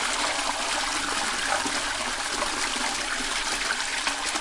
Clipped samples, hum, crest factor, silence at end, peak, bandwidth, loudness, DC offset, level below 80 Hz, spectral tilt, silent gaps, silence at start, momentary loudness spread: under 0.1%; none; 18 dB; 0 s; -8 dBFS; 11.5 kHz; -26 LUFS; under 0.1%; -48 dBFS; 0 dB/octave; none; 0 s; 2 LU